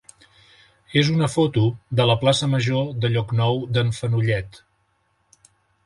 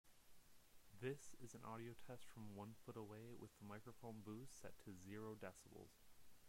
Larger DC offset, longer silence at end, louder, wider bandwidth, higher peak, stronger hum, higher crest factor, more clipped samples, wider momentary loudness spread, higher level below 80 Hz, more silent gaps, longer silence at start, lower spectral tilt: neither; first, 1.3 s vs 0 s; first, -21 LUFS vs -58 LUFS; second, 11.5 kHz vs 16 kHz; first, -4 dBFS vs -38 dBFS; neither; about the same, 18 dB vs 20 dB; neither; second, 5 LU vs 8 LU; first, -50 dBFS vs -76 dBFS; neither; first, 0.9 s vs 0.05 s; about the same, -6 dB/octave vs -5.5 dB/octave